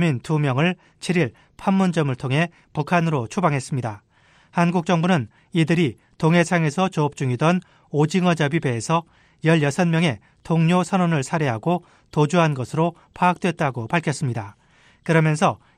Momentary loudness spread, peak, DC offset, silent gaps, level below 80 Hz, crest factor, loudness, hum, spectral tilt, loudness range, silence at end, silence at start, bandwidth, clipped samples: 8 LU; -4 dBFS; under 0.1%; none; -58 dBFS; 16 dB; -21 LUFS; none; -6.5 dB/octave; 2 LU; 0.2 s; 0 s; 11 kHz; under 0.1%